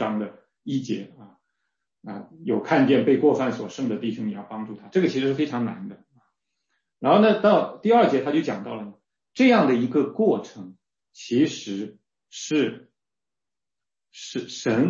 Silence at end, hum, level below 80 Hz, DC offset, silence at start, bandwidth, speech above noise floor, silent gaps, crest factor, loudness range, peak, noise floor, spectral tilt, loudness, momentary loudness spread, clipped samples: 0 s; none; -72 dBFS; under 0.1%; 0 s; 7.6 kHz; over 68 dB; none; 18 dB; 8 LU; -6 dBFS; under -90 dBFS; -6 dB/octave; -23 LUFS; 20 LU; under 0.1%